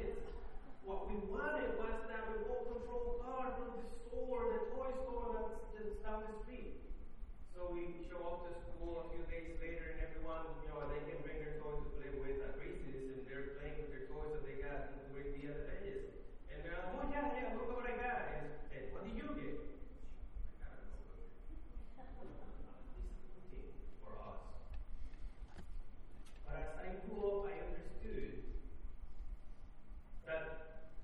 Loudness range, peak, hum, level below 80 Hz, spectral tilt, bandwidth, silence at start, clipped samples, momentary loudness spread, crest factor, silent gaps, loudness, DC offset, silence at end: 11 LU; -28 dBFS; none; -50 dBFS; -7.5 dB/octave; 4.6 kHz; 0 s; under 0.1%; 16 LU; 16 dB; none; -47 LUFS; under 0.1%; 0 s